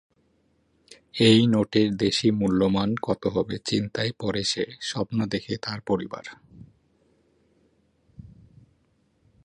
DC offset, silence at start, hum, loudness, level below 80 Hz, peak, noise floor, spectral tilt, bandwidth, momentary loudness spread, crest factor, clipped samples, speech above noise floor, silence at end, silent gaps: under 0.1%; 1.15 s; none; -24 LUFS; -56 dBFS; -4 dBFS; -67 dBFS; -5.5 dB/octave; 11 kHz; 12 LU; 22 dB; under 0.1%; 43 dB; 1.25 s; none